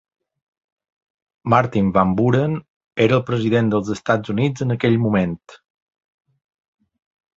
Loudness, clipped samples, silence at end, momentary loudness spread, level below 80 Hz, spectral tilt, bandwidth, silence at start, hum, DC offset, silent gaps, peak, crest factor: -19 LUFS; under 0.1%; 1.8 s; 8 LU; -50 dBFS; -7.5 dB/octave; 7.8 kHz; 1.45 s; none; under 0.1%; 2.68-2.80 s, 2.86-2.91 s; 0 dBFS; 20 dB